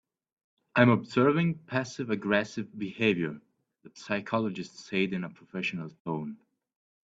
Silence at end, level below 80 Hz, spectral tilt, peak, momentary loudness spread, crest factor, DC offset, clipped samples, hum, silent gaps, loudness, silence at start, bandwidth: 0.7 s; -68 dBFS; -6.5 dB/octave; -6 dBFS; 14 LU; 24 dB; under 0.1%; under 0.1%; none; 6.00-6.05 s; -29 LUFS; 0.75 s; 8 kHz